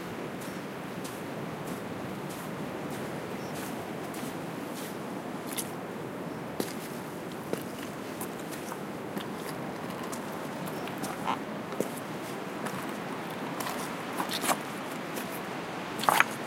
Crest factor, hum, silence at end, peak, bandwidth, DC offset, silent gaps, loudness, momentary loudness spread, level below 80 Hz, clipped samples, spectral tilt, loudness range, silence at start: 34 dB; none; 0 s; 0 dBFS; 17 kHz; under 0.1%; none; -35 LUFS; 6 LU; -68 dBFS; under 0.1%; -4 dB/octave; 3 LU; 0 s